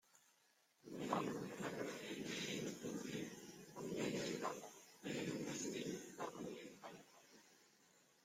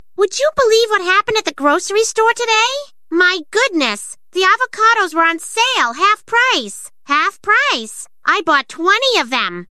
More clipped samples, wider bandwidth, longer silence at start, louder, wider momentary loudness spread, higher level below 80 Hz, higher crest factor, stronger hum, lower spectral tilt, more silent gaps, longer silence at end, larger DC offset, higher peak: neither; first, 16.5 kHz vs 14 kHz; about the same, 0.15 s vs 0.2 s; second, -47 LUFS vs -14 LUFS; first, 15 LU vs 6 LU; second, -82 dBFS vs -58 dBFS; first, 24 dB vs 14 dB; neither; first, -4 dB/octave vs -1 dB/octave; neither; first, 0.25 s vs 0.05 s; second, under 0.1% vs 0.6%; second, -24 dBFS vs -2 dBFS